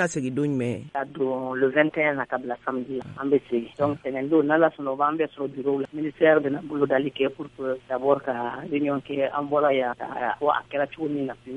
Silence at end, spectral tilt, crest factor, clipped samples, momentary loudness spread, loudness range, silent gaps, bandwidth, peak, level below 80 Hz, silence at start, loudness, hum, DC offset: 0 s; -6 dB/octave; 20 dB; under 0.1%; 9 LU; 2 LU; none; 9.6 kHz; -6 dBFS; -64 dBFS; 0 s; -25 LUFS; none; under 0.1%